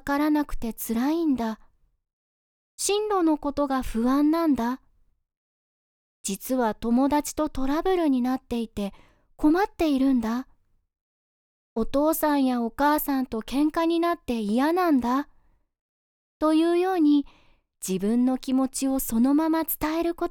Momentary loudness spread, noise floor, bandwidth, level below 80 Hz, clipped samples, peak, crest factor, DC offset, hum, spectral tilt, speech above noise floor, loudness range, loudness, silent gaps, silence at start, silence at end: 10 LU; under -90 dBFS; over 20 kHz; -46 dBFS; under 0.1%; -10 dBFS; 14 dB; under 0.1%; none; -4.5 dB/octave; over 66 dB; 3 LU; -25 LUFS; 2.13-2.78 s, 5.37-6.24 s, 11.01-11.76 s, 15.81-16.40 s; 0.05 s; 0 s